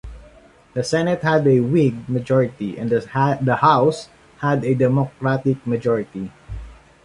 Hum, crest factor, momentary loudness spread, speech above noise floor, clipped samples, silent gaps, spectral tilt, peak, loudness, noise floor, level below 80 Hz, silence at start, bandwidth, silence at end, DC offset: none; 18 dB; 15 LU; 30 dB; under 0.1%; none; -7.5 dB/octave; -2 dBFS; -19 LUFS; -48 dBFS; -46 dBFS; 0.05 s; 11.5 kHz; 0.3 s; under 0.1%